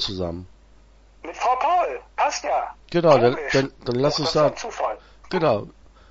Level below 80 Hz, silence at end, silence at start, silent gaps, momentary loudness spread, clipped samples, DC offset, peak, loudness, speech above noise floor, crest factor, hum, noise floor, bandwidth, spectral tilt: -50 dBFS; 0.4 s; 0 s; none; 13 LU; under 0.1%; under 0.1%; -2 dBFS; -22 LUFS; 30 dB; 20 dB; none; -51 dBFS; 8 kHz; -5 dB/octave